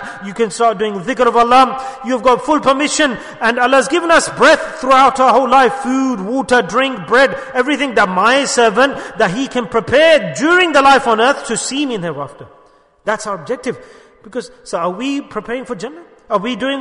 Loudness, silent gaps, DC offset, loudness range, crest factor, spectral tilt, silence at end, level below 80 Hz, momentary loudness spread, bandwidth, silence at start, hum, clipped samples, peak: -13 LUFS; none; under 0.1%; 11 LU; 14 dB; -3.5 dB/octave; 0 s; -48 dBFS; 14 LU; 11 kHz; 0 s; none; under 0.1%; 0 dBFS